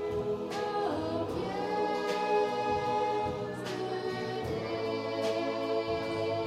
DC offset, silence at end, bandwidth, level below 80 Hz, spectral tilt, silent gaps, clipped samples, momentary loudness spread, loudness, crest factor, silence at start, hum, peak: under 0.1%; 0 s; 14 kHz; -60 dBFS; -5.5 dB/octave; none; under 0.1%; 5 LU; -32 LUFS; 14 dB; 0 s; none; -18 dBFS